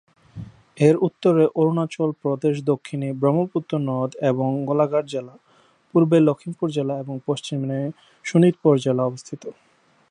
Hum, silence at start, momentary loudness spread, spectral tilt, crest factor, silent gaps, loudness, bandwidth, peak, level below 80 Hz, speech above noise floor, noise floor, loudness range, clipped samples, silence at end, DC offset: none; 0.35 s; 14 LU; -7.5 dB/octave; 18 dB; none; -21 LUFS; 10.5 kHz; -2 dBFS; -66 dBFS; 37 dB; -57 dBFS; 2 LU; under 0.1%; 0.6 s; under 0.1%